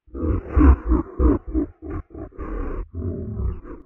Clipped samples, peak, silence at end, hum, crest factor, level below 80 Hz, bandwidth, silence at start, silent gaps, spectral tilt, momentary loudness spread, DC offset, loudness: under 0.1%; -4 dBFS; 0.05 s; none; 18 dB; -24 dBFS; 2.9 kHz; 0.15 s; none; -12.5 dB/octave; 17 LU; under 0.1%; -23 LUFS